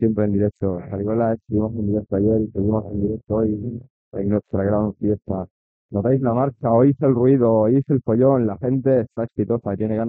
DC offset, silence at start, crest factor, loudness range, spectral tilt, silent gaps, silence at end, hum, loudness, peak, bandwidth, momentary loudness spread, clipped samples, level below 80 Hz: under 0.1%; 0 s; 16 dB; 5 LU; -14 dB/octave; 3.90-4.12 s, 5.51-5.89 s; 0 s; none; -20 LUFS; -4 dBFS; 3.6 kHz; 10 LU; under 0.1%; -48 dBFS